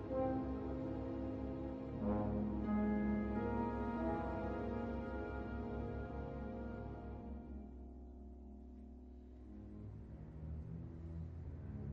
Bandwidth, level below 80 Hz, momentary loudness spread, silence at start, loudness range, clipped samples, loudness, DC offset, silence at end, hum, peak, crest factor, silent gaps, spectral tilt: 5.8 kHz; -52 dBFS; 16 LU; 0 s; 13 LU; under 0.1%; -43 LUFS; under 0.1%; 0 s; none; -28 dBFS; 16 dB; none; -10.5 dB/octave